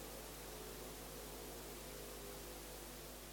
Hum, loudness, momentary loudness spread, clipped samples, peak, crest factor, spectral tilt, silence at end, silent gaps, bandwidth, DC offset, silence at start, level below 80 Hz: none; -50 LUFS; 1 LU; under 0.1%; -38 dBFS; 12 dB; -3 dB/octave; 0 s; none; 18 kHz; under 0.1%; 0 s; -60 dBFS